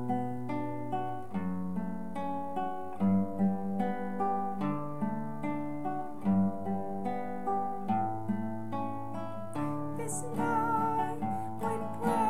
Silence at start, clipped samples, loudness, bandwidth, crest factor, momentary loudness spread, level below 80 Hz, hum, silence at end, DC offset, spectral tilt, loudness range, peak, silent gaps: 0 s; under 0.1%; -34 LUFS; 14.5 kHz; 16 dB; 7 LU; -64 dBFS; none; 0 s; 1%; -7.5 dB/octave; 2 LU; -18 dBFS; none